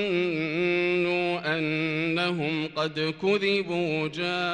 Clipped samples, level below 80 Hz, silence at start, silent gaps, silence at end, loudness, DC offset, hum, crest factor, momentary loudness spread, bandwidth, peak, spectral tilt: under 0.1%; -64 dBFS; 0 s; none; 0 s; -26 LUFS; under 0.1%; none; 14 dB; 4 LU; 9.6 kHz; -12 dBFS; -6 dB/octave